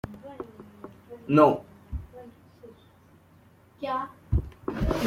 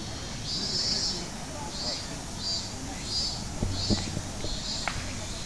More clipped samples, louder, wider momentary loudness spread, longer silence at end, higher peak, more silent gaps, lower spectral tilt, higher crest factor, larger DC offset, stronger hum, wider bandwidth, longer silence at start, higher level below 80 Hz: neither; first, -26 LUFS vs -31 LUFS; first, 26 LU vs 9 LU; about the same, 0 s vs 0 s; first, -6 dBFS vs -12 dBFS; neither; first, -8 dB/octave vs -3 dB/octave; about the same, 24 dB vs 20 dB; second, under 0.1% vs 0.4%; neither; first, 15.5 kHz vs 11 kHz; about the same, 0.05 s vs 0 s; about the same, -40 dBFS vs -42 dBFS